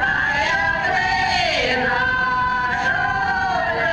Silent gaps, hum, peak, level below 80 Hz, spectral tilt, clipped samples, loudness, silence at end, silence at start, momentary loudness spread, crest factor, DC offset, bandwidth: none; none; -6 dBFS; -40 dBFS; -3.5 dB/octave; under 0.1%; -18 LUFS; 0 s; 0 s; 2 LU; 14 dB; under 0.1%; 11 kHz